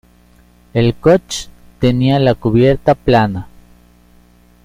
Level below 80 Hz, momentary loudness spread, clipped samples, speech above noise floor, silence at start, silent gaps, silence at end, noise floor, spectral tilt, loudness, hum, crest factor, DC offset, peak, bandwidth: -36 dBFS; 13 LU; under 0.1%; 35 dB; 0.75 s; none; 1.2 s; -48 dBFS; -6.5 dB/octave; -14 LUFS; 60 Hz at -35 dBFS; 14 dB; under 0.1%; 0 dBFS; 14.5 kHz